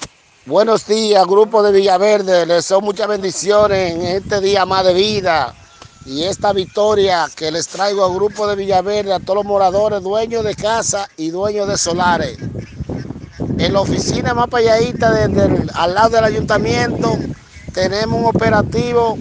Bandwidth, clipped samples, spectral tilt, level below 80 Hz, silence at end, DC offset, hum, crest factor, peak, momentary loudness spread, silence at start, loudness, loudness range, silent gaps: 10 kHz; under 0.1%; -4.5 dB/octave; -40 dBFS; 0 s; under 0.1%; none; 16 dB; 0 dBFS; 9 LU; 0 s; -15 LUFS; 4 LU; none